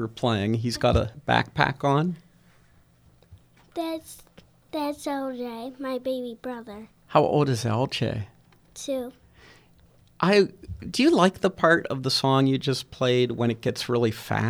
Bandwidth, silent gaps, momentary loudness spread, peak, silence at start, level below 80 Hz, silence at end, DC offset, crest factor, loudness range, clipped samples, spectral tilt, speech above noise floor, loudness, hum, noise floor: over 20 kHz; none; 15 LU; -2 dBFS; 0 s; -48 dBFS; 0 s; under 0.1%; 24 dB; 11 LU; under 0.1%; -5.5 dB/octave; 34 dB; -25 LUFS; none; -58 dBFS